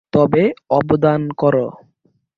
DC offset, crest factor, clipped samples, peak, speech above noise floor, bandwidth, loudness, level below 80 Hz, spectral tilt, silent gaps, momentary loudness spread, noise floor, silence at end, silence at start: under 0.1%; 16 dB; under 0.1%; -2 dBFS; 46 dB; 6.4 kHz; -16 LUFS; -52 dBFS; -10 dB/octave; none; 5 LU; -62 dBFS; 0.65 s; 0.15 s